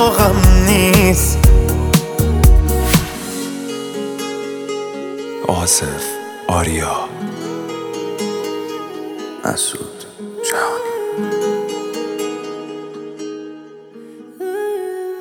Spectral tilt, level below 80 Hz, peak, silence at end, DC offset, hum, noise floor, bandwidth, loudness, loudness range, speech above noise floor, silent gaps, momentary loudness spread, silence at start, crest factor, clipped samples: -4.5 dB/octave; -20 dBFS; 0 dBFS; 0 s; under 0.1%; none; -37 dBFS; over 20 kHz; -17 LUFS; 10 LU; 21 dB; none; 17 LU; 0 s; 16 dB; under 0.1%